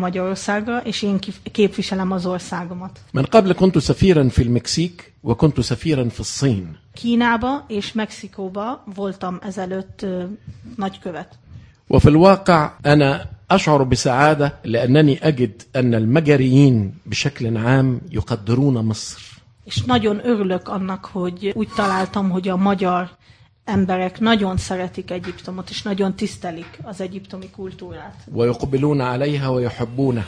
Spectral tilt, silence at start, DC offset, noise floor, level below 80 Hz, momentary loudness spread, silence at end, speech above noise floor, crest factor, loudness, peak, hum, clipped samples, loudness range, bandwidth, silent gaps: -6.5 dB/octave; 0 s; under 0.1%; -50 dBFS; -40 dBFS; 16 LU; 0 s; 32 dB; 18 dB; -19 LUFS; 0 dBFS; none; under 0.1%; 10 LU; 10.5 kHz; none